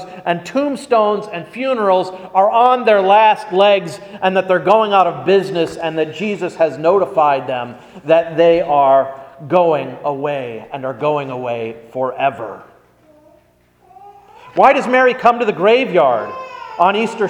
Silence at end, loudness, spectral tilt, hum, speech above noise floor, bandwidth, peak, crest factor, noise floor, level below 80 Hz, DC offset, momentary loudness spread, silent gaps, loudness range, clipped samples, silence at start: 0 s; -15 LUFS; -5.5 dB/octave; 60 Hz at -50 dBFS; 39 dB; 11 kHz; 0 dBFS; 16 dB; -53 dBFS; -60 dBFS; under 0.1%; 13 LU; none; 9 LU; under 0.1%; 0 s